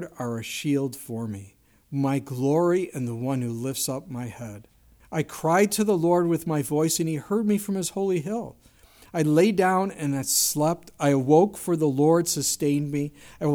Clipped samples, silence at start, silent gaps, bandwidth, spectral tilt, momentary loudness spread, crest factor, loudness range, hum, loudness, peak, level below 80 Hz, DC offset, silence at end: under 0.1%; 0 s; none; over 20 kHz; -5 dB/octave; 13 LU; 18 dB; 5 LU; none; -24 LUFS; -6 dBFS; -60 dBFS; under 0.1%; 0 s